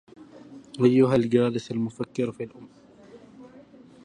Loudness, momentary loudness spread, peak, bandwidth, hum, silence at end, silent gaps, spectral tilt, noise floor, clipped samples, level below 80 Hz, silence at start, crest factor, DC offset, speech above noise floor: -24 LUFS; 19 LU; -6 dBFS; 10 kHz; none; 0.45 s; none; -7.5 dB/octave; -50 dBFS; under 0.1%; -64 dBFS; 0.2 s; 20 dB; under 0.1%; 27 dB